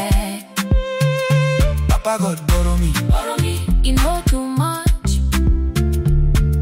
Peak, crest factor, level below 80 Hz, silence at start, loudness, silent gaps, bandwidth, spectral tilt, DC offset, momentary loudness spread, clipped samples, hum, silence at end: -6 dBFS; 10 dB; -18 dBFS; 0 s; -18 LUFS; none; 16.5 kHz; -5.5 dB/octave; under 0.1%; 3 LU; under 0.1%; none; 0 s